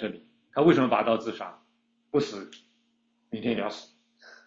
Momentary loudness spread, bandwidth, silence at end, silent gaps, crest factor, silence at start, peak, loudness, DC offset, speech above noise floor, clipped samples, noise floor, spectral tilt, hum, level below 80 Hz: 20 LU; 7.6 kHz; 0.65 s; none; 22 dB; 0 s; -8 dBFS; -27 LUFS; under 0.1%; 45 dB; under 0.1%; -71 dBFS; -6.5 dB/octave; none; -68 dBFS